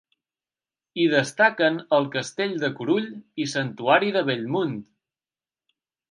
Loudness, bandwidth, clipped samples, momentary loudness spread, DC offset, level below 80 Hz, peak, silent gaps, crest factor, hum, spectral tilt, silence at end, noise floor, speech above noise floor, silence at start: -23 LUFS; 11.5 kHz; under 0.1%; 10 LU; under 0.1%; -76 dBFS; -4 dBFS; none; 22 dB; none; -5 dB/octave; 1.25 s; under -90 dBFS; over 67 dB; 0.95 s